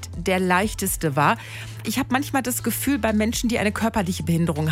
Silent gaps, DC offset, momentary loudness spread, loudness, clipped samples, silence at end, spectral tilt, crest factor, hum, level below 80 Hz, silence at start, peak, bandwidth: none; under 0.1%; 6 LU; -22 LUFS; under 0.1%; 0 s; -4.5 dB/octave; 16 dB; none; -42 dBFS; 0 s; -6 dBFS; 16.5 kHz